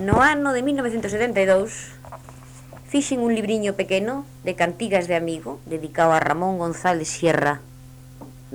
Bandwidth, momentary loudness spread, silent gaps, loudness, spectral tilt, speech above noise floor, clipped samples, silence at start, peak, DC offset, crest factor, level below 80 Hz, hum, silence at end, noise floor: over 20 kHz; 22 LU; none; -22 LUFS; -5 dB/octave; 21 dB; under 0.1%; 0 s; -4 dBFS; under 0.1%; 18 dB; -46 dBFS; none; 0 s; -43 dBFS